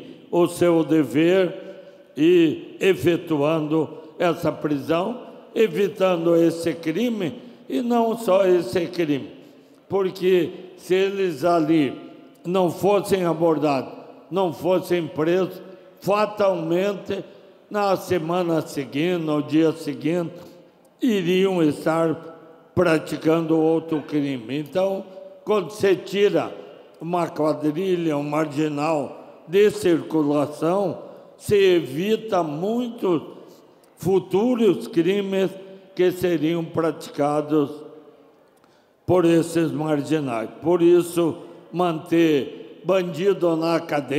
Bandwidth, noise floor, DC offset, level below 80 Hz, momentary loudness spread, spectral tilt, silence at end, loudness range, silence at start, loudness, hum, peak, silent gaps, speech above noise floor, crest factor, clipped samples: 15.5 kHz; -57 dBFS; under 0.1%; -64 dBFS; 11 LU; -6.5 dB/octave; 0 s; 3 LU; 0 s; -22 LUFS; none; -6 dBFS; none; 36 dB; 16 dB; under 0.1%